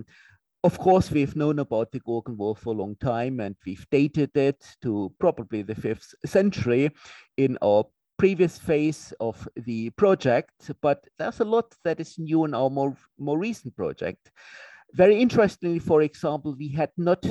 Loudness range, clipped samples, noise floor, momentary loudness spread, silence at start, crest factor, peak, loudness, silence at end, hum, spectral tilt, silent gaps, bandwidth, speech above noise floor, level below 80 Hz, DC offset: 3 LU; under 0.1%; -58 dBFS; 11 LU; 0 s; 18 dB; -6 dBFS; -25 LUFS; 0 s; none; -7.5 dB/octave; none; 12 kHz; 33 dB; -56 dBFS; under 0.1%